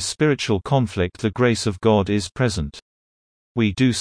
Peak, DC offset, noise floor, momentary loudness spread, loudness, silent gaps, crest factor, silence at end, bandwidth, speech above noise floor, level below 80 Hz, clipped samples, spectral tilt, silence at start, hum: -4 dBFS; under 0.1%; under -90 dBFS; 5 LU; -21 LUFS; 2.82-3.55 s; 16 dB; 0 s; 10.5 kHz; over 70 dB; -44 dBFS; under 0.1%; -5.5 dB/octave; 0 s; none